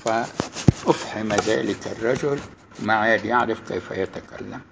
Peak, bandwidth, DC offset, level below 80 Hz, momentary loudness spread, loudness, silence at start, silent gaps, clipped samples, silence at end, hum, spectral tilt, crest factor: 0 dBFS; 8 kHz; under 0.1%; -44 dBFS; 11 LU; -23 LUFS; 0 s; none; under 0.1%; 0.1 s; none; -5.5 dB/octave; 24 dB